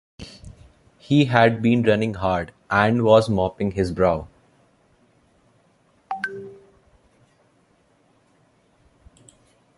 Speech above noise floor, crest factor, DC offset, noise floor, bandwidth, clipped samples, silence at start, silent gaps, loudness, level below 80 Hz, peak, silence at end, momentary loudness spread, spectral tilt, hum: 42 dB; 24 dB; under 0.1%; -61 dBFS; 11.5 kHz; under 0.1%; 0.2 s; none; -20 LUFS; -48 dBFS; 0 dBFS; 3.25 s; 21 LU; -7 dB/octave; none